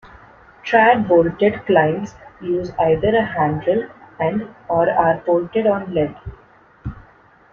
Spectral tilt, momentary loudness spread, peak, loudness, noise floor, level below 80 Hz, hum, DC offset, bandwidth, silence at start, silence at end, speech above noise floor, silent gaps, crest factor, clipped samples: -8 dB/octave; 19 LU; -2 dBFS; -18 LUFS; -50 dBFS; -46 dBFS; none; under 0.1%; 6.8 kHz; 0.65 s; 0.55 s; 32 dB; none; 18 dB; under 0.1%